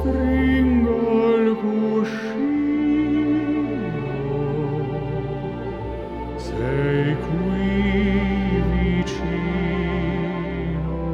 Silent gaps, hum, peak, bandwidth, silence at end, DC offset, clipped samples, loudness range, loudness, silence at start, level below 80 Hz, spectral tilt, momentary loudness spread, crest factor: none; none; -8 dBFS; 8.4 kHz; 0 s; under 0.1%; under 0.1%; 5 LU; -22 LUFS; 0 s; -32 dBFS; -8.5 dB/octave; 9 LU; 14 dB